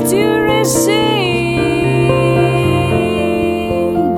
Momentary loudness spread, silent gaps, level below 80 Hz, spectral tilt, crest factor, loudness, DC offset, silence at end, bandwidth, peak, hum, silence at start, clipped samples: 3 LU; none; -36 dBFS; -5 dB/octave; 12 dB; -13 LUFS; under 0.1%; 0 s; 17.5 kHz; 0 dBFS; none; 0 s; under 0.1%